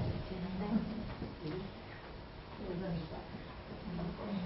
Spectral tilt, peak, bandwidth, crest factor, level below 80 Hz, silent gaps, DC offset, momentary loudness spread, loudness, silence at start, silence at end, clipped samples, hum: -6.5 dB/octave; -22 dBFS; 5.6 kHz; 18 dB; -52 dBFS; none; under 0.1%; 12 LU; -42 LUFS; 0 s; 0 s; under 0.1%; none